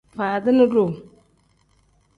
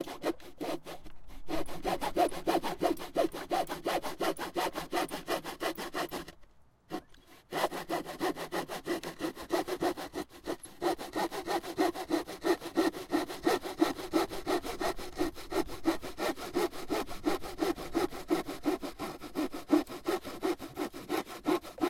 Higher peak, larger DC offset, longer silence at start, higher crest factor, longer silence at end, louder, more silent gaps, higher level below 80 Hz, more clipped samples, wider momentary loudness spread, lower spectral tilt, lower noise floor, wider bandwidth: first, -6 dBFS vs -14 dBFS; neither; first, 0.15 s vs 0 s; about the same, 16 dB vs 20 dB; first, 1.15 s vs 0 s; first, -19 LUFS vs -35 LUFS; neither; second, -60 dBFS vs -54 dBFS; neither; about the same, 10 LU vs 9 LU; first, -8.5 dB/octave vs -4 dB/octave; first, -61 dBFS vs -57 dBFS; second, 5 kHz vs 16.5 kHz